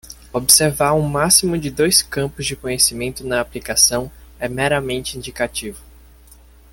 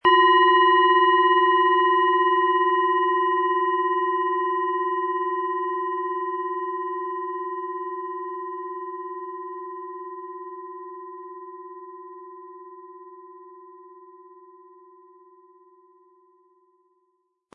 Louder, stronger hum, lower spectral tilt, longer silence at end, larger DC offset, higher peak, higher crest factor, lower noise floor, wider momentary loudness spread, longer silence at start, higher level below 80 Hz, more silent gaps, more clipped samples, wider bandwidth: first, -17 LUFS vs -21 LUFS; neither; second, -2.5 dB/octave vs -5.5 dB/octave; second, 0.9 s vs 3.5 s; neither; first, 0 dBFS vs -6 dBFS; about the same, 20 dB vs 18 dB; second, -46 dBFS vs -72 dBFS; second, 15 LU vs 24 LU; about the same, 0.05 s vs 0.05 s; first, -42 dBFS vs -78 dBFS; neither; neither; first, 17 kHz vs 4.3 kHz